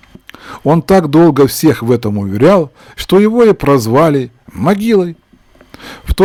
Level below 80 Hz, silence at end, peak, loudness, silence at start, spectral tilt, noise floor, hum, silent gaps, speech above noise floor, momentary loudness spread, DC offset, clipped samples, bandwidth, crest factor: -32 dBFS; 0 s; 0 dBFS; -11 LUFS; 0.45 s; -6.5 dB/octave; -45 dBFS; none; none; 35 dB; 15 LU; under 0.1%; under 0.1%; 19 kHz; 10 dB